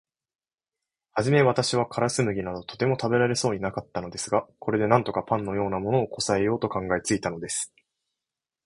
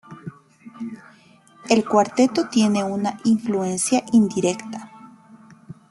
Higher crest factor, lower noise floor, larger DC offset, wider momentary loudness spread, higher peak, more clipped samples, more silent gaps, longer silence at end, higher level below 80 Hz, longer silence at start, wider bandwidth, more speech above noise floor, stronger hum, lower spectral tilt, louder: about the same, 24 dB vs 20 dB; first, -89 dBFS vs -52 dBFS; neither; second, 9 LU vs 21 LU; about the same, -4 dBFS vs -2 dBFS; neither; neither; first, 1 s vs 0.2 s; first, -56 dBFS vs -64 dBFS; first, 1.15 s vs 0.1 s; about the same, 11.5 kHz vs 12 kHz; first, 64 dB vs 32 dB; neither; about the same, -5 dB/octave vs -5 dB/octave; second, -26 LUFS vs -20 LUFS